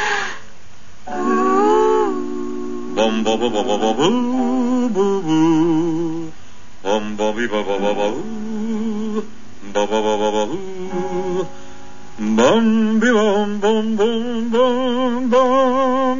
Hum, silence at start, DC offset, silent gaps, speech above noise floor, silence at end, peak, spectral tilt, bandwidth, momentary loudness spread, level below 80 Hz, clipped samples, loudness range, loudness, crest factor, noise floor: none; 0 s; 5%; none; 28 dB; 0 s; -2 dBFS; -5 dB/octave; 7.4 kHz; 12 LU; -52 dBFS; under 0.1%; 6 LU; -18 LUFS; 16 dB; -45 dBFS